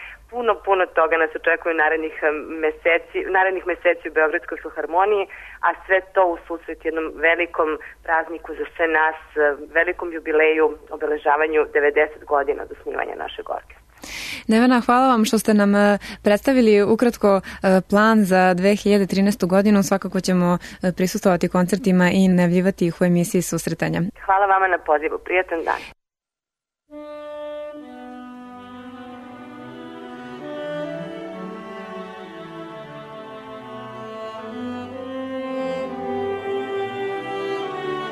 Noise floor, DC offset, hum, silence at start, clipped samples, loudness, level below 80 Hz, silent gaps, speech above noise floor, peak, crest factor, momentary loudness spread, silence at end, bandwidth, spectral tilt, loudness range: -90 dBFS; under 0.1%; none; 0 s; under 0.1%; -20 LUFS; -52 dBFS; none; 71 dB; -6 dBFS; 16 dB; 20 LU; 0 s; 13.5 kHz; -6 dB/octave; 17 LU